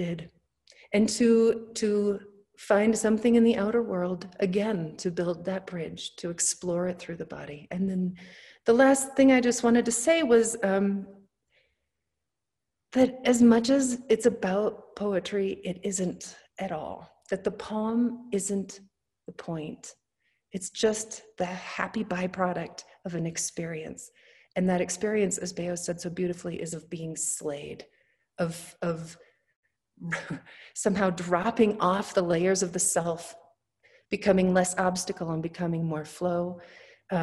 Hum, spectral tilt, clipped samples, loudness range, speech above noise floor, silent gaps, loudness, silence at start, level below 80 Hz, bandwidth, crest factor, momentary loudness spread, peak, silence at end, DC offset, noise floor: none; -4.5 dB/octave; under 0.1%; 9 LU; 60 dB; 29.56-29.63 s; -27 LUFS; 0 s; -64 dBFS; 12.5 kHz; 20 dB; 17 LU; -8 dBFS; 0 s; under 0.1%; -87 dBFS